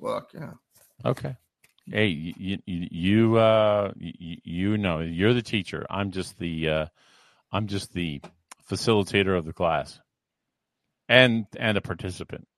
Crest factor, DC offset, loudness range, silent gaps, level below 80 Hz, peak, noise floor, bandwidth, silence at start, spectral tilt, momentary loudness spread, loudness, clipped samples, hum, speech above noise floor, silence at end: 24 dB; under 0.1%; 5 LU; none; -52 dBFS; -2 dBFS; -84 dBFS; 13 kHz; 0 s; -6 dB/octave; 18 LU; -25 LUFS; under 0.1%; none; 58 dB; 0.2 s